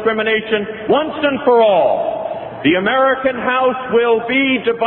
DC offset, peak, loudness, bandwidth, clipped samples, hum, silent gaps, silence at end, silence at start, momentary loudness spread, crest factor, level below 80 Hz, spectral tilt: under 0.1%; 0 dBFS; -15 LUFS; 4.2 kHz; under 0.1%; none; none; 0 s; 0 s; 7 LU; 14 dB; -52 dBFS; -9 dB/octave